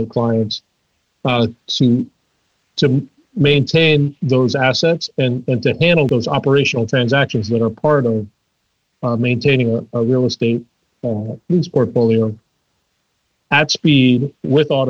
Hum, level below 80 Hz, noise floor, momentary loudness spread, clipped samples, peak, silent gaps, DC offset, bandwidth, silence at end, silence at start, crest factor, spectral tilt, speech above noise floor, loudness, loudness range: none; -54 dBFS; -68 dBFS; 10 LU; under 0.1%; -2 dBFS; none; under 0.1%; 7.2 kHz; 0 s; 0 s; 14 dB; -6.5 dB/octave; 53 dB; -16 LUFS; 4 LU